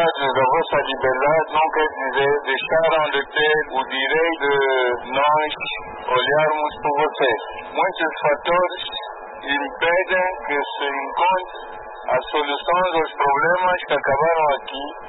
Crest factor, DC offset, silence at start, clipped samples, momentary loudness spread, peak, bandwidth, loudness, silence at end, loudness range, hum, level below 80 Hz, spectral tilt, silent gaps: 12 dB; under 0.1%; 0 s; under 0.1%; 8 LU; -8 dBFS; 4.1 kHz; -20 LUFS; 0 s; 3 LU; none; -50 dBFS; -8.5 dB/octave; none